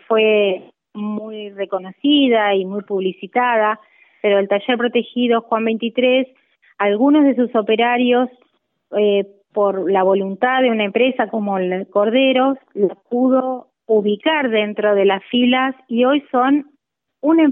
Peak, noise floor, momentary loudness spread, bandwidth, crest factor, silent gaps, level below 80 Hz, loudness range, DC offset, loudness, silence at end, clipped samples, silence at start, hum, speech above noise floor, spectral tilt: -2 dBFS; -67 dBFS; 10 LU; 3.9 kHz; 14 dB; none; -72 dBFS; 2 LU; under 0.1%; -17 LUFS; 0 s; under 0.1%; 0.1 s; none; 50 dB; -9.5 dB/octave